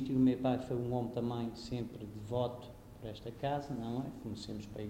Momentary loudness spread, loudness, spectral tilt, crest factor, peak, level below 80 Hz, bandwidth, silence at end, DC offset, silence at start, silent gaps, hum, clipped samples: 15 LU; -38 LUFS; -7.5 dB/octave; 18 dB; -20 dBFS; -58 dBFS; 15.5 kHz; 0 s; under 0.1%; 0 s; none; none; under 0.1%